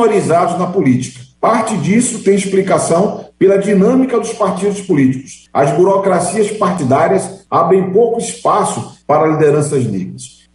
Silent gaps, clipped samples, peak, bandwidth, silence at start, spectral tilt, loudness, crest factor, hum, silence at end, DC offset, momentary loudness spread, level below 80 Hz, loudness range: none; under 0.1%; -2 dBFS; 11.5 kHz; 0 s; -6 dB/octave; -13 LUFS; 12 dB; none; 0.3 s; under 0.1%; 7 LU; -52 dBFS; 1 LU